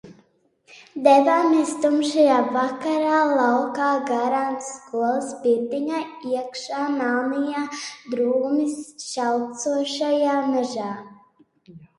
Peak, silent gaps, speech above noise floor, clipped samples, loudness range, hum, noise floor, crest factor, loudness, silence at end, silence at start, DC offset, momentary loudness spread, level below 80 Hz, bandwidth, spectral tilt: -2 dBFS; none; 39 dB; under 0.1%; 6 LU; none; -61 dBFS; 20 dB; -22 LUFS; 0.15 s; 0.05 s; under 0.1%; 12 LU; -72 dBFS; 11.5 kHz; -3.5 dB/octave